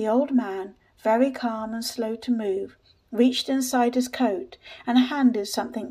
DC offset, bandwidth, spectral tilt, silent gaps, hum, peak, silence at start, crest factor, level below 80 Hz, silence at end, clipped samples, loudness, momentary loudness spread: under 0.1%; 15.5 kHz; -4 dB/octave; none; none; -8 dBFS; 0 s; 16 dB; -66 dBFS; 0 s; under 0.1%; -24 LUFS; 11 LU